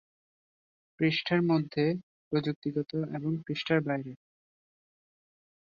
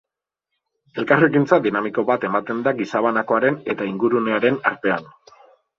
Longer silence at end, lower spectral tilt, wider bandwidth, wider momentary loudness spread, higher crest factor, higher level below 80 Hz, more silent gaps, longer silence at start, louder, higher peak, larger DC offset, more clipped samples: first, 1.65 s vs 0.7 s; about the same, -8 dB/octave vs -7.5 dB/octave; about the same, 7 kHz vs 7.4 kHz; about the same, 8 LU vs 8 LU; about the same, 18 dB vs 18 dB; second, -72 dBFS vs -64 dBFS; first, 2.03-2.31 s, 2.56-2.62 s vs none; about the same, 1 s vs 0.95 s; second, -30 LUFS vs -20 LUFS; second, -14 dBFS vs -2 dBFS; neither; neither